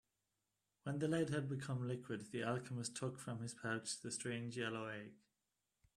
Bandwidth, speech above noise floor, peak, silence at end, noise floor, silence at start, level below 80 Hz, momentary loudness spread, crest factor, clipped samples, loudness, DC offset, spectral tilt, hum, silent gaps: 13.5 kHz; 46 dB; -26 dBFS; 0.8 s; -89 dBFS; 0.85 s; -80 dBFS; 8 LU; 18 dB; under 0.1%; -44 LUFS; under 0.1%; -5 dB/octave; none; none